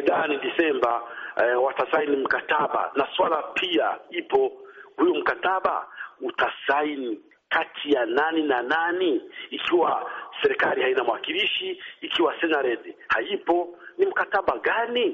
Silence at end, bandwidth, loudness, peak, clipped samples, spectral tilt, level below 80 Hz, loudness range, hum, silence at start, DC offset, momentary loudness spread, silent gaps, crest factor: 0 s; 7.2 kHz; -24 LUFS; -10 dBFS; under 0.1%; 0 dB/octave; -66 dBFS; 2 LU; none; 0 s; under 0.1%; 9 LU; none; 16 dB